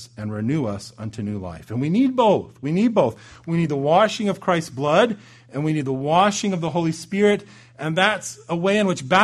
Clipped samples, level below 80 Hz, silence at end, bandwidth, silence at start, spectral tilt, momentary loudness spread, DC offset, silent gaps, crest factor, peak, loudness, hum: under 0.1%; -58 dBFS; 0 s; 12.5 kHz; 0 s; -5.5 dB/octave; 12 LU; under 0.1%; none; 18 dB; -2 dBFS; -21 LUFS; none